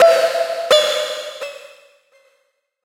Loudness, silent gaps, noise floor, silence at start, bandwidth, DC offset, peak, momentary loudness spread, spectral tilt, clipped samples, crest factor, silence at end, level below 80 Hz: -17 LUFS; none; -66 dBFS; 0 s; 16.5 kHz; under 0.1%; -2 dBFS; 18 LU; 0.5 dB/octave; under 0.1%; 16 dB; 1.25 s; -72 dBFS